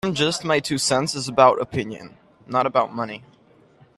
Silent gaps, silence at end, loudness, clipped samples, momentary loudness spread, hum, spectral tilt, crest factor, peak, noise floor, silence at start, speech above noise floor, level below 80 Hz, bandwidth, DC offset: none; 0.8 s; -21 LUFS; under 0.1%; 15 LU; none; -4 dB/octave; 22 dB; 0 dBFS; -55 dBFS; 0.05 s; 33 dB; -58 dBFS; 13.5 kHz; under 0.1%